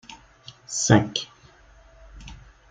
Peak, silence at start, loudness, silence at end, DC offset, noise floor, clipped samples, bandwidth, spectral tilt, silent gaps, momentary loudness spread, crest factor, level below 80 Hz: -4 dBFS; 0.1 s; -22 LUFS; 0.35 s; under 0.1%; -53 dBFS; under 0.1%; 9.6 kHz; -4.5 dB/octave; none; 26 LU; 24 dB; -50 dBFS